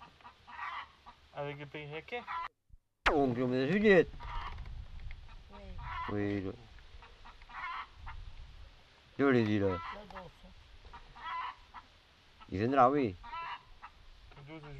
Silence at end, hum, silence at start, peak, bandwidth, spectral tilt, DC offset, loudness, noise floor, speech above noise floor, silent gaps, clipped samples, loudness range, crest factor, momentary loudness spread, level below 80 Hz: 0 s; none; 0 s; -14 dBFS; 9.2 kHz; -7 dB/octave; under 0.1%; -33 LUFS; -63 dBFS; 31 dB; none; under 0.1%; 10 LU; 22 dB; 27 LU; -52 dBFS